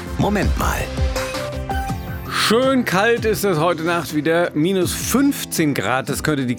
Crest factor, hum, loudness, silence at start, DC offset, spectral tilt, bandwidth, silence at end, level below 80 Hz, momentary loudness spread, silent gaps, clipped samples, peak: 16 dB; none; -19 LUFS; 0 s; under 0.1%; -4.5 dB/octave; over 20 kHz; 0 s; -32 dBFS; 8 LU; none; under 0.1%; -2 dBFS